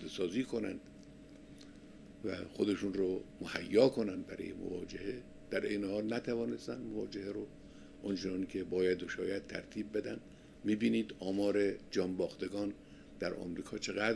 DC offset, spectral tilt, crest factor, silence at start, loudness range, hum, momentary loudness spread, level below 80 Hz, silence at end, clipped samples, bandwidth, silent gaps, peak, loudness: under 0.1%; -5.5 dB/octave; 22 dB; 0 s; 4 LU; none; 22 LU; -64 dBFS; 0 s; under 0.1%; 11 kHz; none; -16 dBFS; -37 LUFS